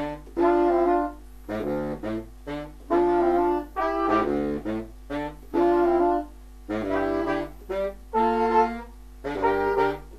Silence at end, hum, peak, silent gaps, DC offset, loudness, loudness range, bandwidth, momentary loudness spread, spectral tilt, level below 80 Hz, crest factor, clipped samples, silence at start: 0 s; none; -8 dBFS; none; 0.1%; -25 LUFS; 2 LU; 13.5 kHz; 13 LU; -7 dB/octave; -44 dBFS; 16 dB; under 0.1%; 0 s